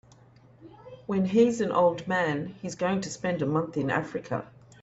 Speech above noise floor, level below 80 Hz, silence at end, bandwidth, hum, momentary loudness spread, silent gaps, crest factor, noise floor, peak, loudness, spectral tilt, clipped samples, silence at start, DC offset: 29 dB; -64 dBFS; 0.35 s; 8.2 kHz; none; 12 LU; none; 18 dB; -55 dBFS; -10 dBFS; -27 LUFS; -6 dB/octave; under 0.1%; 0.6 s; under 0.1%